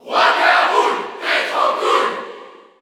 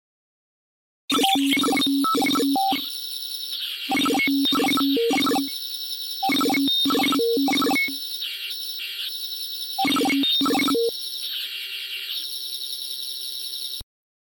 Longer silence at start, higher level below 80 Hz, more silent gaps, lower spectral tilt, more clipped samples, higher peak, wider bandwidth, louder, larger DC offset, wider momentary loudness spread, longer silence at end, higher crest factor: second, 0.05 s vs 1.1 s; second, -74 dBFS vs -64 dBFS; neither; about the same, -1 dB/octave vs -2 dB/octave; neither; first, -2 dBFS vs -8 dBFS; about the same, 18 kHz vs 17 kHz; first, -16 LUFS vs -22 LUFS; neither; about the same, 9 LU vs 9 LU; about the same, 0.3 s vs 0.4 s; about the same, 16 dB vs 16 dB